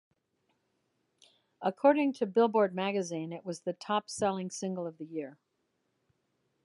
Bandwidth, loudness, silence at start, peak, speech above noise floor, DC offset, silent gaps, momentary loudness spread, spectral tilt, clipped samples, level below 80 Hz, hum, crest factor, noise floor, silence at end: 11.5 kHz; -31 LUFS; 1.6 s; -12 dBFS; 48 dB; under 0.1%; none; 13 LU; -5 dB/octave; under 0.1%; -80 dBFS; none; 22 dB; -79 dBFS; 1.3 s